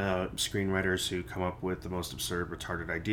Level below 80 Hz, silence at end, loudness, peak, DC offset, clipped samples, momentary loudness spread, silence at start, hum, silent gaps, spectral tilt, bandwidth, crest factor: -50 dBFS; 0 s; -33 LUFS; -16 dBFS; under 0.1%; under 0.1%; 7 LU; 0 s; none; none; -4 dB/octave; 19.5 kHz; 18 dB